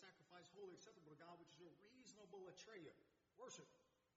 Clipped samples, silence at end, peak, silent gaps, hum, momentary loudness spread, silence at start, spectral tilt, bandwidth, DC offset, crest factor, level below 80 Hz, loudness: under 0.1%; 0.05 s; -48 dBFS; none; none; 6 LU; 0 s; -3.5 dB/octave; 7.6 kHz; under 0.1%; 16 dB; under -90 dBFS; -63 LUFS